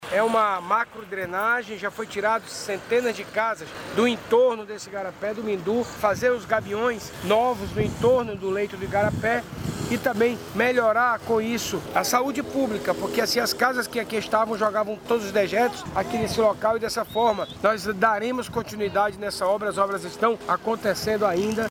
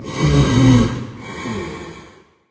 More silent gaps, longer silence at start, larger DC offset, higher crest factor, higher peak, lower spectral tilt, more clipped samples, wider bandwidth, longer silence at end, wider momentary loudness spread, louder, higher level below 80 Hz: neither; about the same, 0 s vs 0 s; neither; about the same, 18 dB vs 16 dB; second, -6 dBFS vs 0 dBFS; second, -4.5 dB/octave vs -6.5 dB/octave; neither; first, 18.5 kHz vs 8 kHz; second, 0 s vs 0.45 s; second, 7 LU vs 19 LU; second, -24 LUFS vs -16 LUFS; second, -52 dBFS vs -30 dBFS